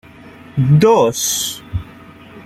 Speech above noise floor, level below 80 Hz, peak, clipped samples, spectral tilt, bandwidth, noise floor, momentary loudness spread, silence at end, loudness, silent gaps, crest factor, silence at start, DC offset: 26 dB; -42 dBFS; -2 dBFS; under 0.1%; -5 dB/octave; 15.5 kHz; -39 dBFS; 16 LU; 0.05 s; -14 LUFS; none; 14 dB; 0.25 s; under 0.1%